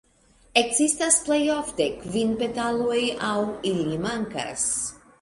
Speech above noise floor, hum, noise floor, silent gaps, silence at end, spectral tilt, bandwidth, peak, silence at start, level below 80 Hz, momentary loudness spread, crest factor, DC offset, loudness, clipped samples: 34 dB; none; -58 dBFS; none; 0.25 s; -3 dB/octave; 11.5 kHz; -4 dBFS; 0.55 s; -54 dBFS; 8 LU; 22 dB; under 0.1%; -24 LUFS; under 0.1%